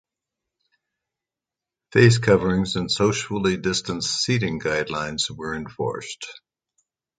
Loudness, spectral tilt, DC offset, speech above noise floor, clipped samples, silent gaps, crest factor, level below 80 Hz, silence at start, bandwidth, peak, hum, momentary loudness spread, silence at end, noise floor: -22 LUFS; -4.5 dB/octave; under 0.1%; 67 dB; under 0.1%; none; 22 dB; -50 dBFS; 1.95 s; 9.4 kHz; -2 dBFS; none; 14 LU; 0.8 s; -88 dBFS